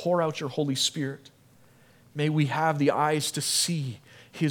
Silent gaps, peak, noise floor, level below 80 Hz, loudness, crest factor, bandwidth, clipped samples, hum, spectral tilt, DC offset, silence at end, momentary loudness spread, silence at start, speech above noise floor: none; -10 dBFS; -57 dBFS; -74 dBFS; -26 LUFS; 18 dB; 18 kHz; under 0.1%; none; -4 dB/octave; under 0.1%; 0 s; 15 LU; 0 s; 31 dB